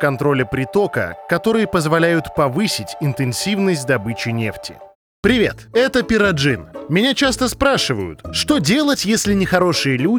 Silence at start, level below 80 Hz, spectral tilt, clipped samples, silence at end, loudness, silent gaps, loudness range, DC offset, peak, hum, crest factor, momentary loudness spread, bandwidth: 0 s; -42 dBFS; -4.5 dB/octave; under 0.1%; 0 s; -17 LUFS; 4.95-5.23 s; 3 LU; under 0.1%; -2 dBFS; none; 16 dB; 7 LU; over 20 kHz